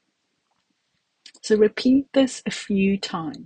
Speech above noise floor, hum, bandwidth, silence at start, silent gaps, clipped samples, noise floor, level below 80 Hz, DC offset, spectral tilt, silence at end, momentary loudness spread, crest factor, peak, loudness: 52 dB; none; 9.6 kHz; 1.45 s; none; under 0.1%; -73 dBFS; -58 dBFS; under 0.1%; -5.5 dB/octave; 0 s; 11 LU; 18 dB; -6 dBFS; -21 LUFS